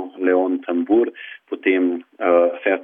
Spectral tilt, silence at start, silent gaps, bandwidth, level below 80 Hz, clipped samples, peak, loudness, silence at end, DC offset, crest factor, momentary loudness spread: -8.5 dB/octave; 0 s; none; 3.7 kHz; -70 dBFS; under 0.1%; -4 dBFS; -19 LUFS; 0 s; under 0.1%; 16 dB; 8 LU